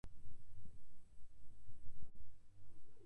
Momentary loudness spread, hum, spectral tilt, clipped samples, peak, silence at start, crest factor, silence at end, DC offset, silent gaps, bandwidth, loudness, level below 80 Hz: 4 LU; none; -7 dB/octave; under 0.1%; -30 dBFS; 0.05 s; 10 dB; 0 s; under 0.1%; none; 10 kHz; -66 LUFS; -62 dBFS